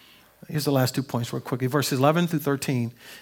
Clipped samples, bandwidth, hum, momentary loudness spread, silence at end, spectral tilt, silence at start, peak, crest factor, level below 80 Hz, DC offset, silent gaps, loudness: under 0.1%; 18 kHz; none; 8 LU; 0 s; -5.5 dB/octave; 0.5 s; -6 dBFS; 20 dB; -68 dBFS; under 0.1%; none; -25 LUFS